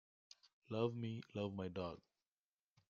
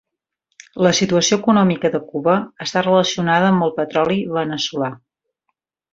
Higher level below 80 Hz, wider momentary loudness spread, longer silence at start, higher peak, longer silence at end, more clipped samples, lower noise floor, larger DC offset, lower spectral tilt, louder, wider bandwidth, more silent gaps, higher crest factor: second, -80 dBFS vs -58 dBFS; first, 23 LU vs 7 LU; second, 0.45 s vs 0.75 s; second, -26 dBFS vs -2 dBFS; about the same, 0.9 s vs 1 s; neither; first, under -90 dBFS vs -75 dBFS; neither; first, -6.5 dB/octave vs -4.5 dB/octave; second, -45 LUFS vs -17 LUFS; about the same, 7.2 kHz vs 7.8 kHz; first, 0.53-0.62 s vs none; first, 22 dB vs 16 dB